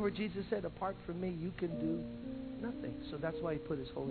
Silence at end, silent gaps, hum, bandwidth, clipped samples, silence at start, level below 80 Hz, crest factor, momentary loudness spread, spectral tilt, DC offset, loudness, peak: 0 s; none; none; 4.6 kHz; under 0.1%; 0 s; -58 dBFS; 16 dB; 6 LU; -6.5 dB/octave; under 0.1%; -41 LUFS; -24 dBFS